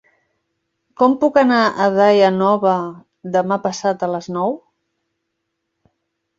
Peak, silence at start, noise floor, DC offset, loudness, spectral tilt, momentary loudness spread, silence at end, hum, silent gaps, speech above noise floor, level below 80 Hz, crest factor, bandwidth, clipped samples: -2 dBFS; 1 s; -75 dBFS; under 0.1%; -16 LUFS; -6 dB/octave; 10 LU; 1.8 s; none; none; 59 dB; -64 dBFS; 16 dB; 7.8 kHz; under 0.1%